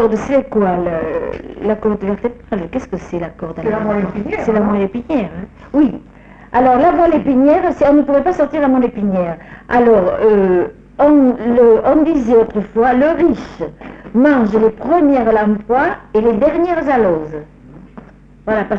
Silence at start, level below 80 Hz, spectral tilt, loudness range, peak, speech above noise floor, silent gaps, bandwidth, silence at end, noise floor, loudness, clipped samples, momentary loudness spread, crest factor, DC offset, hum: 0 s; -38 dBFS; -8.5 dB/octave; 7 LU; -2 dBFS; 25 dB; none; 7.4 kHz; 0 s; -38 dBFS; -14 LUFS; under 0.1%; 12 LU; 12 dB; under 0.1%; none